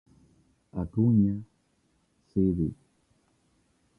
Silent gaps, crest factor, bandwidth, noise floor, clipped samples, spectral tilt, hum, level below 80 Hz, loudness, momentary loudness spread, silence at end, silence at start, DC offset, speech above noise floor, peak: none; 18 dB; 2 kHz; -70 dBFS; under 0.1%; -12.5 dB/octave; none; -50 dBFS; -28 LUFS; 14 LU; 1.25 s; 0.75 s; under 0.1%; 45 dB; -12 dBFS